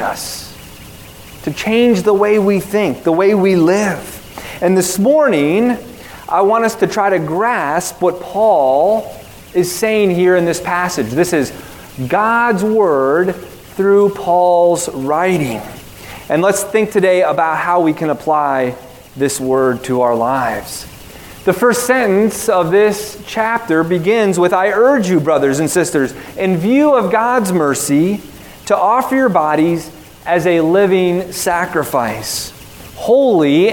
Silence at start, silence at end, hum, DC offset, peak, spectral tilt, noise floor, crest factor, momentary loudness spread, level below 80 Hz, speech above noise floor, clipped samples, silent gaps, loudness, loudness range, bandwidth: 0 s; 0 s; none; 0.1%; 0 dBFS; -5 dB/octave; -35 dBFS; 14 dB; 16 LU; -46 dBFS; 22 dB; under 0.1%; none; -14 LUFS; 2 LU; 18 kHz